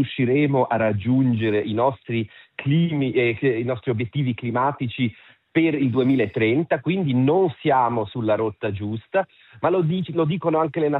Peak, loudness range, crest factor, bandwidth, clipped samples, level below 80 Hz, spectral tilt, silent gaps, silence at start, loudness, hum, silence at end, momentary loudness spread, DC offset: -6 dBFS; 2 LU; 14 dB; 4.1 kHz; under 0.1%; -64 dBFS; -11 dB/octave; none; 0 s; -22 LUFS; none; 0 s; 7 LU; under 0.1%